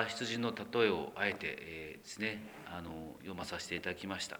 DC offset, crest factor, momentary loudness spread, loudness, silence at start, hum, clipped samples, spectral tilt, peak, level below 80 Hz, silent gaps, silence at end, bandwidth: under 0.1%; 24 dB; 14 LU; -38 LUFS; 0 s; none; under 0.1%; -4 dB/octave; -16 dBFS; -66 dBFS; none; 0 s; over 20 kHz